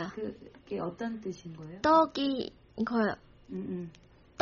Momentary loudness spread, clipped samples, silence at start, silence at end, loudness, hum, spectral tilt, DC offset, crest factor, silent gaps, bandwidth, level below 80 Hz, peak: 19 LU; under 0.1%; 0 s; 0 s; -32 LUFS; none; -4 dB/octave; under 0.1%; 22 dB; none; 7 kHz; -62 dBFS; -12 dBFS